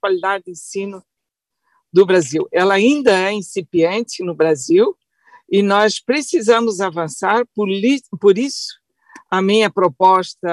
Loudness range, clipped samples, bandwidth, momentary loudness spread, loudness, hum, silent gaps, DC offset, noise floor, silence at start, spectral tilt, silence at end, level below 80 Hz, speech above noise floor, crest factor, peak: 2 LU; under 0.1%; 12 kHz; 11 LU; -16 LUFS; none; none; under 0.1%; -80 dBFS; 0.05 s; -4.5 dB/octave; 0 s; -66 dBFS; 65 dB; 14 dB; -2 dBFS